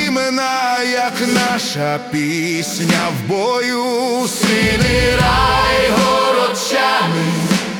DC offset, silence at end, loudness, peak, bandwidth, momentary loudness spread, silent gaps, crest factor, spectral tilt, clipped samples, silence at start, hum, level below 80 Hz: under 0.1%; 0 s; -15 LUFS; -2 dBFS; 18 kHz; 5 LU; none; 14 dB; -4 dB/octave; under 0.1%; 0 s; none; -32 dBFS